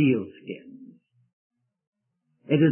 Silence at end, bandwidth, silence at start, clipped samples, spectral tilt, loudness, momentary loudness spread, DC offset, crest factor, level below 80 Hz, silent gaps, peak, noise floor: 0 s; 3.2 kHz; 0 s; under 0.1%; -12 dB/octave; -27 LUFS; 25 LU; under 0.1%; 18 dB; -74 dBFS; 1.33-1.50 s, 1.87-1.93 s; -8 dBFS; -75 dBFS